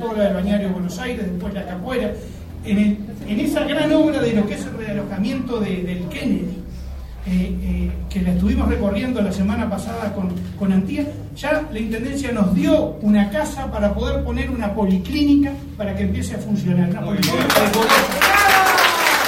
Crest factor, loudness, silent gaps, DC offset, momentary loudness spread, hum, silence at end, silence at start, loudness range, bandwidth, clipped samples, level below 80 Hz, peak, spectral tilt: 20 dB; -19 LUFS; none; under 0.1%; 12 LU; none; 0 s; 0 s; 6 LU; 16.5 kHz; under 0.1%; -32 dBFS; 0 dBFS; -5 dB/octave